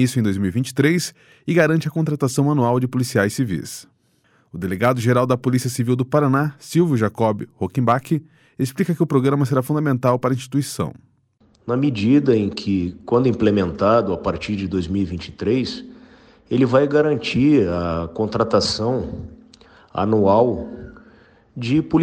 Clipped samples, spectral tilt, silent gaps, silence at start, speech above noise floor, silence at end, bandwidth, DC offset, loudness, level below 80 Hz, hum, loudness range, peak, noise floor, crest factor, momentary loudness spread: under 0.1%; -6.5 dB/octave; none; 0 s; 41 dB; 0 s; 16.5 kHz; under 0.1%; -20 LUFS; -48 dBFS; none; 2 LU; -4 dBFS; -60 dBFS; 16 dB; 11 LU